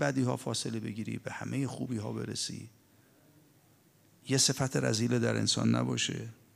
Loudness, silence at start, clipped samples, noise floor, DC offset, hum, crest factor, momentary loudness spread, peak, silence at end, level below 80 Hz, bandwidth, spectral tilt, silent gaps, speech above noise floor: -32 LUFS; 0 s; under 0.1%; -64 dBFS; under 0.1%; none; 18 dB; 12 LU; -14 dBFS; 0.2 s; -70 dBFS; 15.5 kHz; -4 dB/octave; none; 32 dB